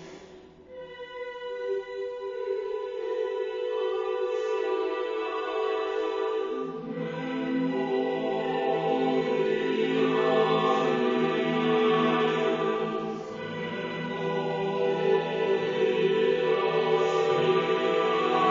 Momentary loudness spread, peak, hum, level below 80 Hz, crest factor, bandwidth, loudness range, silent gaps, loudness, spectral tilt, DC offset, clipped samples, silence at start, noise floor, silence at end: 11 LU; -12 dBFS; none; -68 dBFS; 16 dB; 7.6 kHz; 6 LU; none; -27 LUFS; -6 dB/octave; under 0.1%; under 0.1%; 0 s; -49 dBFS; 0 s